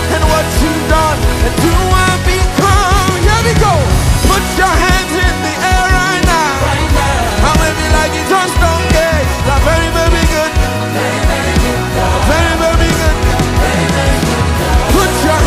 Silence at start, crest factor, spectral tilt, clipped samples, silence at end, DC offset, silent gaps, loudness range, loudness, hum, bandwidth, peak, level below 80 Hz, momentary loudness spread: 0 s; 10 dB; -4.5 dB/octave; under 0.1%; 0 s; under 0.1%; none; 2 LU; -11 LUFS; none; 16 kHz; 0 dBFS; -16 dBFS; 3 LU